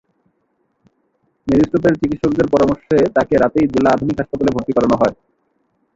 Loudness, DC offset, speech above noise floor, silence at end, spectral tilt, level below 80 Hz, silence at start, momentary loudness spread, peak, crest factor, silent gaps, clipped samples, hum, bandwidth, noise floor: -16 LUFS; under 0.1%; 51 dB; 0.85 s; -7.5 dB/octave; -42 dBFS; 1.45 s; 4 LU; -2 dBFS; 16 dB; none; under 0.1%; none; 7.8 kHz; -66 dBFS